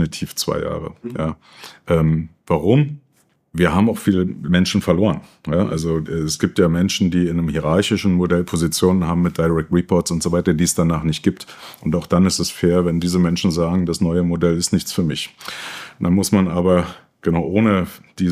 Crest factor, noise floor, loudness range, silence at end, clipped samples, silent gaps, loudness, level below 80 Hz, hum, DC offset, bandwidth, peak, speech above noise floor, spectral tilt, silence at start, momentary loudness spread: 16 dB; -61 dBFS; 2 LU; 0 s; under 0.1%; none; -18 LUFS; -40 dBFS; none; under 0.1%; 15.5 kHz; -2 dBFS; 43 dB; -6 dB/octave; 0 s; 10 LU